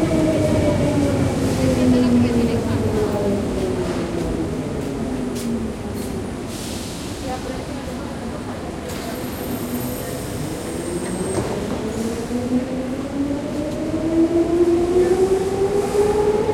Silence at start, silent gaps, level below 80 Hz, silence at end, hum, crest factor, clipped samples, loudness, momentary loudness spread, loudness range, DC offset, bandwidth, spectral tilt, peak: 0 s; none; -36 dBFS; 0 s; none; 14 dB; under 0.1%; -21 LUFS; 11 LU; 9 LU; under 0.1%; 16.5 kHz; -6.5 dB/octave; -6 dBFS